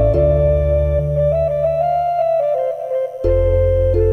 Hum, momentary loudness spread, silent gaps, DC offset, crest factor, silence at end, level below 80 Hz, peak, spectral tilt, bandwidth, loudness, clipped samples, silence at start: none; 6 LU; none; under 0.1%; 12 dB; 0 s; -24 dBFS; -4 dBFS; -10 dB/octave; 6 kHz; -17 LUFS; under 0.1%; 0 s